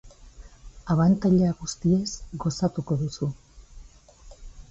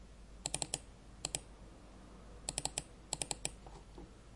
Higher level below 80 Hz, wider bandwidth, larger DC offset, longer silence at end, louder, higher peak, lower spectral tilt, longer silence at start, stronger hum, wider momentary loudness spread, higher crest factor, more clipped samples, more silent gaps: first, -46 dBFS vs -56 dBFS; second, 8 kHz vs 11.5 kHz; neither; about the same, 0.1 s vs 0 s; first, -25 LUFS vs -41 LUFS; first, -10 dBFS vs -16 dBFS; first, -7 dB/octave vs -1.5 dB/octave; about the same, 0.05 s vs 0 s; neither; second, 12 LU vs 19 LU; second, 16 dB vs 30 dB; neither; neither